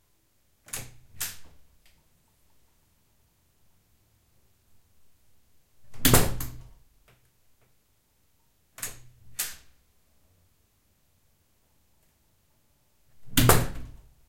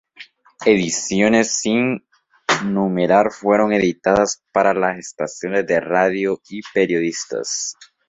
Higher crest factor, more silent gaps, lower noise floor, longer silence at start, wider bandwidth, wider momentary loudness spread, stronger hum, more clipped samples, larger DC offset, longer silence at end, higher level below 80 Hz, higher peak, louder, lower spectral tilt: first, 30 dB vs 18 dB; neither; first, -69 dBFS vs -44 dBFS; first, 0.75 s vs 0.2 s; first, 16.5 kHz vs 8.2 kHz; first, 28 LU vs 9 LU; neither; neither; neither; first, 0.4 s vs 0.25 s; first, -42 dBFS vs -54 dBFS; about the same, -2 dBFS vs -2 dBFS; second, -27 LUFS vs -18 LUFS; about the same, -3.5 dB/octave vs -4 dB/octave